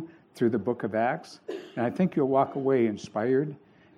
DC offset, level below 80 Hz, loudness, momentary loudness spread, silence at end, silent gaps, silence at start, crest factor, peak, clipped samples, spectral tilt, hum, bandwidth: under 0.1%; -72 dBFS; -27 LUFS; 12 LU; 0.4 s; none; 0 s; 18 dB; -10 dBFS; under 0.1%; -8 dB/octave; none; 11 kHz